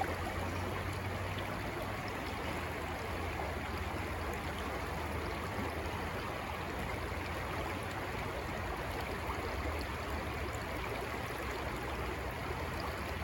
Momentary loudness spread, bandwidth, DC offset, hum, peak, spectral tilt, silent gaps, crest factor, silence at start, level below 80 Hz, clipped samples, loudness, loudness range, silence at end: 1 LU; 18.5 kHz; under 0.1%; none; -20 dBFS; -5 dB/octave; none; 18 dB; 0 s; -46 dBFS; under 0.1%; -39 LUFS; 0 LU; 0 s